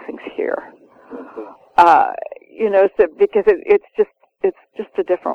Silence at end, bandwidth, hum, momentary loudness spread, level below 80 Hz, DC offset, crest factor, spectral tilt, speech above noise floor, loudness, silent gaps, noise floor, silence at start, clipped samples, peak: 0 s; 7.6 kHz; none; 21 LU; -54 dBFS; under 0.1%; 18 dB; -6 dB/octave; 21 dB; -17 LUFS; none; -36 dBFS; 0 s; under 0.1%; 0 dBFS